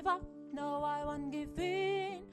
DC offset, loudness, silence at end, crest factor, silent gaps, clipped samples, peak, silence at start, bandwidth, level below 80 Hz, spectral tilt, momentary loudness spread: under 0.1%; -38 LUFS; 0 s; 16 dB; none; under 0.1%; -22 dBFS; 0 s; 12.5 kHz; -58 dBFS; -5.5 dB/octave; 6 LU